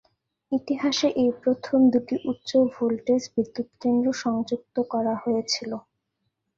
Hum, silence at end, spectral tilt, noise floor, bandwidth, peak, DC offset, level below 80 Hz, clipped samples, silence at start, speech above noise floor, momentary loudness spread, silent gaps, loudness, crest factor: none; 0.8 s; -4.5 dB/octave; -78 dBFS; 7.6 kHz; -10 dBFS; under 0.1%; -66 dBFS; under 0.1%; 0.5 s; 54 dB; 8 LU; none; -25 LUFS; 14 dB